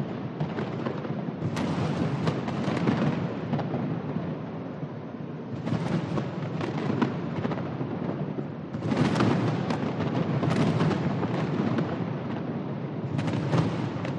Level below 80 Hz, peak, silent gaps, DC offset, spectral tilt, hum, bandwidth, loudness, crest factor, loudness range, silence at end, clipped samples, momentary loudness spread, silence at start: -60 dBFS; -10 dBFS; none; under 0.1%; -7.5 dB/octave; none; 10 kHz; -29 LUFS; 18 dB; 4 LU; 0 s; under 0.1%; 9 LU; 0 s